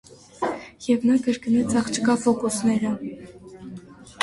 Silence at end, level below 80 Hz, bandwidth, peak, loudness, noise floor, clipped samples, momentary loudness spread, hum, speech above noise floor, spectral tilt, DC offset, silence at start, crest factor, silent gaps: 0 s; -56 dBFS; 11.5 kHz; -6 dBFS; -23 LUFS; -42 dBFS; under 0.1%; 20 LU; none; 20 dB; -4.5 dB/octave; under 0.1%; 0.1 s; 16 dB; none